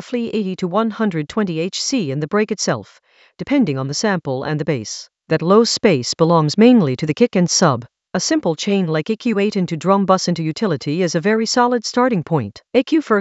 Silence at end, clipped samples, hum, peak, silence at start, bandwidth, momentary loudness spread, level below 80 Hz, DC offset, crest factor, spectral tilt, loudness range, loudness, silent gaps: 0 s; under 0.1%; none; 0 dBFS; 0 s; 8.2 kHz; 8 LU; -58 dBFS; under 0.1%; 18 dB; -5 dB/octave; 5 LU; -17 LUFS; none